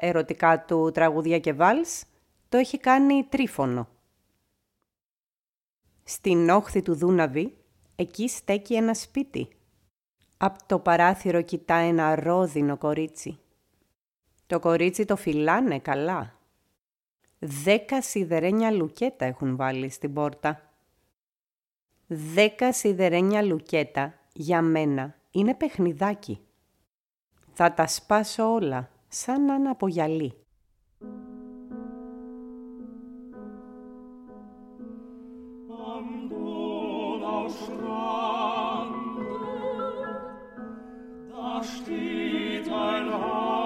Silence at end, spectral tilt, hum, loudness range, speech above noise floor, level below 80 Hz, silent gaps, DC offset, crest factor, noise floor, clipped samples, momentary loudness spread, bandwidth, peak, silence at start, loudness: 0 s; -5.5 dB/octave; none; 11 LU; over 66 dB; -60 dBFS; 5.11-5.16 s, 5.39-5.61 s, 14.01-14.05 s, 21.23-21.27 s, 21.39-21.45 s, 21.82-21.86 s, 27.00-27.10 s; under 0.1%; 22 dB; under -90 dBFS; under 0.1%; 21 LU; 16.5 kHz; -6 dBFS; 0 s; -26 LUFS